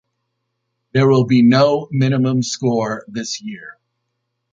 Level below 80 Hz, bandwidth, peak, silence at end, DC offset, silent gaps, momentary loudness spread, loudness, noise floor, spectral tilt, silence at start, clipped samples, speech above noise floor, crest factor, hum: -58 dBFS; 7.6 kHz; -2 dBFS; 0.8 s; under 0.1%; none; 13 LU; -16 LUFS; -74 dBFS; -6 dB/octave; 0.95 s; under 0.1%; 58 dB; 16 dB; none